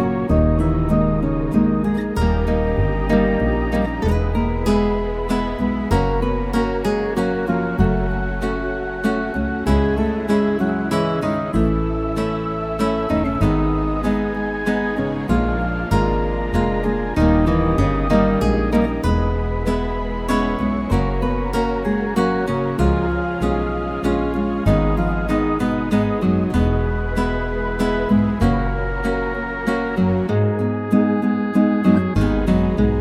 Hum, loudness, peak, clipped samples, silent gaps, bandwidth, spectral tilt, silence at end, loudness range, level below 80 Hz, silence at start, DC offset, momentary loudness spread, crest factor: none; -20 LUFS; -2 dBFS; under 0.1%; none; 14 kHz; -8 dB/octave; 0 s; 2 LU; -26 dBFS; 0 s; under 0.1%; 5 LU; 16 dB